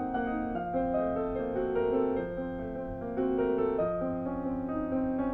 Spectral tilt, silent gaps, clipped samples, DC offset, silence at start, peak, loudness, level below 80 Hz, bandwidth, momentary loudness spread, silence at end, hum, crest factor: -10.5 dB/octave; none; under 0.1%; under 0.1%; 0 s; -18 dBFS; -32 LUFS; -50 dBFS; 4 kHz; 7 LU; 0 s; none; 12 dB